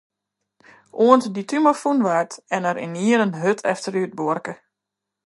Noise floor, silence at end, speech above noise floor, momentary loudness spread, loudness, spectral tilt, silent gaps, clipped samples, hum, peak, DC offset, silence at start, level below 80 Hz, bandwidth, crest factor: -83 dBFS; 0.75 s; 64 dB; 10 LU; -20 LUFS; -5.5 dB/octave; none; under 0.1%; none; 0 dBFS; under 0.1%; 0.95 s; -74 dBFS; 11.5 kHz; 20 dB